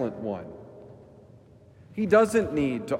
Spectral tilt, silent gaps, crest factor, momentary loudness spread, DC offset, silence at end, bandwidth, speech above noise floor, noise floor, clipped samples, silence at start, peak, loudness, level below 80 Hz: -6.5 dB/octave; none; 20 dB; 24 LU; under 0.1%; 0 s; 15.5 kHz; 28 dB; -53 dBFS; under 0.1%; 0 s; -8 dBFS; -25 LUFS; -58 dBFS